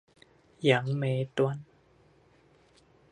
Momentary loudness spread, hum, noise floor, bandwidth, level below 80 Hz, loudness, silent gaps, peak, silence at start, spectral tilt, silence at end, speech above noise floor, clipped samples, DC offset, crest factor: 5 LU; none; -62 dBFS; 10 kHz; -72 dBFS; -29 LUFS; none; -8 dBFS; 0.6 s; -7 dB/octave; 1.5 s; 35 dB; under 0.1%; under 0.1%; 24 dB